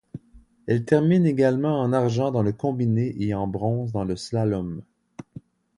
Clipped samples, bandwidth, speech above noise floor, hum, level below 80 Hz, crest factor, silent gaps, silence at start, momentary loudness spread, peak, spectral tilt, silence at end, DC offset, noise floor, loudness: under 0.1%; 11 kHz; 31 dB; none; -52 dBFS; 20 dB; none; 0.15 s; 20 LU; -4 dBFS; -8 dB/octave; 0.4 s; under 0.1%; -54 dBFS; -23 LUFS